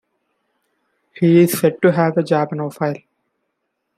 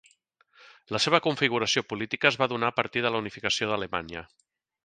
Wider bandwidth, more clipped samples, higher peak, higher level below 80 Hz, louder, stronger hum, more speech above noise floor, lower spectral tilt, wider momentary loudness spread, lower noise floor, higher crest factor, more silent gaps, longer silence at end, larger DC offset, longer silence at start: first, 16 kHz vs 10 kHz; neither; about the same, -2 dBFS vs -4 dBFS; about the same, -64 dBFS vs -62 dBFS; first, -17 LUFS vs -26 LUFS; neither; first, 58 dB vs 38 dB; first, -6.5 dB/octave vs -3.5 dB/octave; about the same, 11 LU vs 10 LU; first, -74 dBFS vs -66 dBFS; second, 16 dB vs 24 dB; neither; first, 1 s vs 0.6 s; neither; first, 1.15 s vs 0.9 s